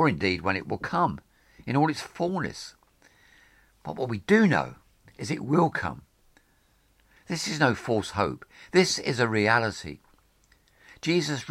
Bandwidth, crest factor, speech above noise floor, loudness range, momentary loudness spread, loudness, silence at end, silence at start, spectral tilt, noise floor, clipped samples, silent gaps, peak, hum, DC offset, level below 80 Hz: 15.5 kHz; 22 dB; 39 dB; 5 LU; 18 LU; -26 LUFS; 0 s; 0 s; -5 dB/octave; -65 dBFS; under 0.1%; none; -6 dBFS; none; under 0.1%; -58 dBFS